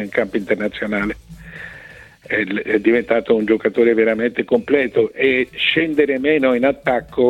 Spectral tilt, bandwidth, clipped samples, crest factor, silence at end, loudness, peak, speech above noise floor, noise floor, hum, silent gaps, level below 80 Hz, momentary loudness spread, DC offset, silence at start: -6.5 dB/octave; 9.4 kHz; under 0.1%; 16 dB; 0 s; -17 LUFS; -2 dBFS; 24 dB; -41 dBFS; none; none; -48 dBFS; 13 LU; under 0.1%; 0 s